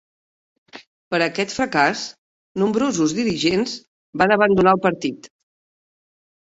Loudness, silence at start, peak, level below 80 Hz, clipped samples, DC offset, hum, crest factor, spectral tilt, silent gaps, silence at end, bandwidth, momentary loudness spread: -19 LUFS; 0.75 s; -2 dBFS; -54 dBFS; under 0.1%; under 0.1%; none; 20 dB; -4.5 dB/octave; 0.87-1.11 s, 2.18-2.55 s, 3.87-4.13 s; 1.2 s; 8.2 kHz; 17 LU